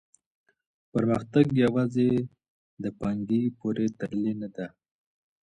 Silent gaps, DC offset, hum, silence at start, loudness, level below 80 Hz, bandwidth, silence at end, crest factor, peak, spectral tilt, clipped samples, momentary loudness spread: 2.48-2.77 s; under 0.1%; none; 0.95 s; -27 LUFS; -60 dBFS; 9.4 kHz; 0.75 s; 20 dB; -8 dBFS; -8.5 dB/octave; under 0.1%; 13 LU